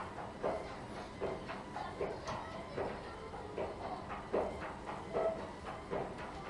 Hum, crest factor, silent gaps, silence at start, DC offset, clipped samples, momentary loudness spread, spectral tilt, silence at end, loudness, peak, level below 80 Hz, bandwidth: none; 20 dB; none; 0 s; under 0.1%; under 0.1%; 8 LU; -6 dB/octave; 0 s; -42 LUFS; -22 dBFS; -58 dBFS; 11.5 kHz